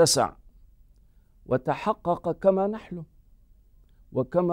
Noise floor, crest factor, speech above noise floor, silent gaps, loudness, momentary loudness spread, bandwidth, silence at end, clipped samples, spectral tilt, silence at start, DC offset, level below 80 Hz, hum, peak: -57 dBFS; 18 dB; 33 dB; none; -26 LUFS; 15 LU; 16 kHz; 0 s; under 0.1%; -4.5 dB/octave; 0 s; under 0.1%; -54 dBFS; none; -8 dBFS